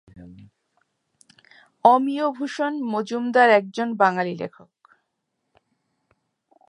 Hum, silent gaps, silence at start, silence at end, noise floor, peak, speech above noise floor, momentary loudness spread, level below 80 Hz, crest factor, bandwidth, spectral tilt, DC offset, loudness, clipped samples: none; none; 0.15 s; 2.2 s; -77 dBFS; -2 dBFS; 57 dB; 11 LU; -68 dBFS; 22 dB; 10.5 kHz; -5.5 dB/octave; under 0.1%; -21 LUFS; under 0.1%